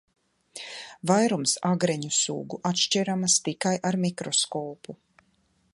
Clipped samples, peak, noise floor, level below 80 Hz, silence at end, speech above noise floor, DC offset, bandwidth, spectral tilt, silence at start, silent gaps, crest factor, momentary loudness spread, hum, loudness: under 0.1%; -6 dBFS; -68 dBFS; -72 dBFS; 0.8 s; 42 dB; under 0.1%; 11.5 kHz; -3.5 dB/octave; 0.55 s; none; 20 dB; 16 LU; none; -25 LUFS